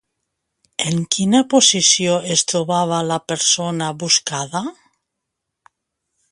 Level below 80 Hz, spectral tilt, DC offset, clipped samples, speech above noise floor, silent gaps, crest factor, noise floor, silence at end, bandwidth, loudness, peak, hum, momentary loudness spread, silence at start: -62 dBFS; -3 dB/octave; under 0.1%; under 0.1%; 61 dB; none; 20 dB; -79 dBFS; 1.6 s; 11.5 kHz; -16 LUFS; 0 dBFS; none; 12 LU; 0.8 s